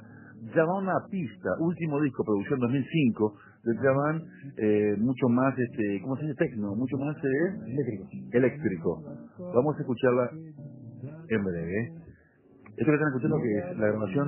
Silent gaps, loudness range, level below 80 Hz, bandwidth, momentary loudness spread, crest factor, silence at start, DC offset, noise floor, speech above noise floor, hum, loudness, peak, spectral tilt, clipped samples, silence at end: none; 3 LU; -60 dBFS; 3.2 kHz; 14 LU; 18 dB; 0 s; under 0.1%; -58 dBFS; 30 dB; none; -28 LUFS; -10 dBFS; -12 dB/octave; under 0.1%; 0 s